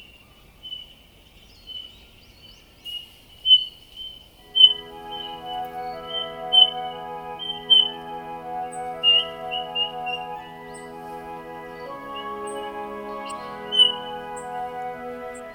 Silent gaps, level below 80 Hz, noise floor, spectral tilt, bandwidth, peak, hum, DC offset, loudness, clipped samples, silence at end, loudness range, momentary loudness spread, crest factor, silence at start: none; -58 dBFS; -51 dBFS; -1.5 dB/octave; over 20 kHz; -2 dBFS; none; under 0.1%; -20 LUFS; under 0.1%; 0 s; 14 LU; 22 LU; 24 dB; 0 s